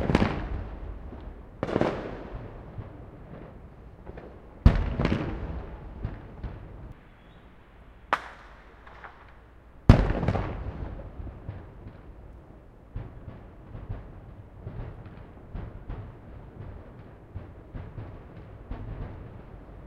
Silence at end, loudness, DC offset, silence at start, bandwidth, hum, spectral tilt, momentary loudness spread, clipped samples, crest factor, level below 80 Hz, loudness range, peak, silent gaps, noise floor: 0 s; -31 LUFS; under 0.1%; 0 s; 9.2 kHz; none; -8 dB/octave; 22 LU; under 0.1%; 32 dB; -36 dBFS; 15 LU; 0 dBFS; none; -51 dBFS